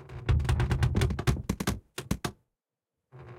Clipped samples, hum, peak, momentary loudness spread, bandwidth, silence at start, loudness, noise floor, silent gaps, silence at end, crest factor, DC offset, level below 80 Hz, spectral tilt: under 0.1%; none; -14 dBFS; 9 LU; 16.5 kHz; 0 s; -30 LUFS; -88 dBFS; none; 0 s; 16 dB; under 0.1%; -36 dBFS; -6 dB/octave